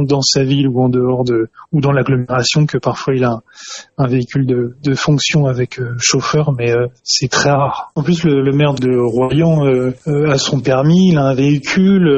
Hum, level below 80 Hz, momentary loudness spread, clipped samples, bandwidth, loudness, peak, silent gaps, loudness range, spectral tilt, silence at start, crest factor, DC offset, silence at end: none; -44 dBFS; 6 LU; under 0.1%; 8 kHz; -14 LUFS; 0 dBFS; none; 3 LU; -5.5 dB/octave; 0 s; 14 dB; under 0.1%; 0 s